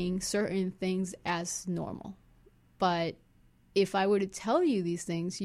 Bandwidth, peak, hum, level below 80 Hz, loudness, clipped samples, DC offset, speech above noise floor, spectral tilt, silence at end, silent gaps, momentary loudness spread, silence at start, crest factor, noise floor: 14.5 kHz; -14 dBFS; none; -62 dBFS; -31 LUFS; under 0.1%; under 0.1%; 32 dB; -5 dB/octave; 0 s; none; 9 LU; 0 s; 16 dB; -63 dBFS